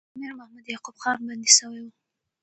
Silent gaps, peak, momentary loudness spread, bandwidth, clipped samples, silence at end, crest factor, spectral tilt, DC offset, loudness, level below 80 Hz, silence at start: none; 0 dBFS; 23 LU; 9.2 kHz; under 0.1%; 0.55 s; 26 dB; 1.5 dB/octave; under 0.1%; -20 LUFS; -78 dBFS; 0.15 s